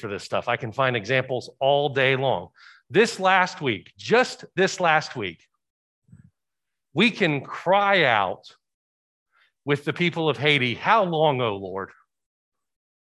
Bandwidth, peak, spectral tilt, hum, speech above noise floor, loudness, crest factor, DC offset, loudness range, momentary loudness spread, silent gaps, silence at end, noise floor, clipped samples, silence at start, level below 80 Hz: 12 kHz; -4 dBFS; -5 dB/octave; none; 64 dB; -22 LUFS; 20 dB; under 0.1%; 3 LU; 12 LU; 5.70-6.02 s, 8.74-9.26 s; 1.15 s; -87 dBFS; under 0.1%; 0 s; -64 dBFS